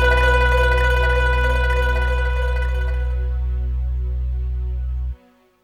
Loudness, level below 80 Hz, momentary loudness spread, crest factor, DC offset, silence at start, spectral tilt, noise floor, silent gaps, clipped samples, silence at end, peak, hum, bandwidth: -20 LUFS; -20 dBFS; 10 LU; 14 dB; under 0.1%; 0 s; -5.5 dB/octave; -49 dBFS; none; under 0.1%; 0.5 s; -4 dBFS; none; 9.6 kHz